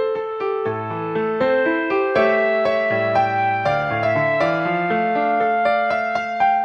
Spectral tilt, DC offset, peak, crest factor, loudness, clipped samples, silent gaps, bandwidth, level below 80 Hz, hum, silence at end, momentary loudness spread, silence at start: -7 dB/octave; under 0.1%; -4 dBFS; 14 dB; -19 LUFS; under 0.1%; none; 7 kHz; -58 dBFS; none; 0 s; 6 LU; 0 s